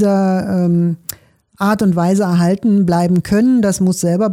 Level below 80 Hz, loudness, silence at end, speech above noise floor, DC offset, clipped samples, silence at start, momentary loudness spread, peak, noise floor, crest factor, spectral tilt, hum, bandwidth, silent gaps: -48 dBFS; -14 LUFS; 0 s; 28 dB; under 0.1%; under 0.1%; 0 s; 5 LU; -4 dBFS; -41 dBFS; 10 dB; -7 dB/octave; none; 16.5 kHz; none